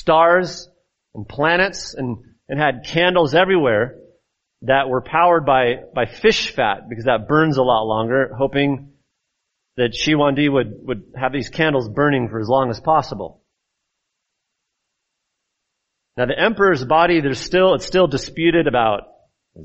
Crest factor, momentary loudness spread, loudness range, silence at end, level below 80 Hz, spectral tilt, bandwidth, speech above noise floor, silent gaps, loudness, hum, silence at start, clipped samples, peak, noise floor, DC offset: 18 dB; 13 LU; 6 LU; 0 s; -46 dBFS; -3.5 dB/octave; 8 kHz; 60 dB; none; -18 LUFS; none; 0 s; under 0.1%; -2 dBFS; -77 dBFS; under 0.1%